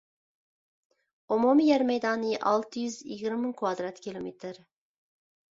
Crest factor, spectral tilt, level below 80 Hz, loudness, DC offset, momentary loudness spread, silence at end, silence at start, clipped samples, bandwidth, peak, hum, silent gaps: 18 dB; -5 dB/octave; -74 dBFS; -28 LUFS; under 0.1%; 16 LU; 0.95 s; 1.3 s; under 0.1%; 7.8 kHz; -12 dBFS; none; none